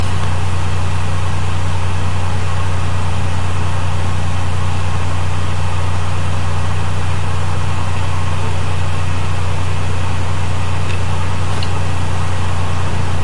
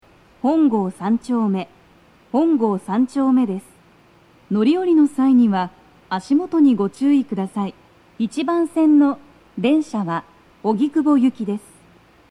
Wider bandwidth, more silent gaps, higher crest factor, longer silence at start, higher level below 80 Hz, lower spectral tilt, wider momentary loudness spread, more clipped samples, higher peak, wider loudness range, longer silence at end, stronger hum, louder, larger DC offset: about the same, 11.5 kHz vs 11 kHz; neither; about the same, 10 dB vs 14 dB; second, 0 s vs 0.45 s; first, -34 dBFS vs -62 dBFS; second, -5.5 dB/octave vs -7.5 dB/octave; second, 1 LU vs 12 LU; neither; about the same, -4 dBFS vs -6 dBFS; second, 0 LU vs 3 LU; second, 0 s vs 0.7 s; first, 50 Hz at -30 dBFS vs none; about the same, -20 LUFS vs -19 LUFS; first, 30% vs under 0.1%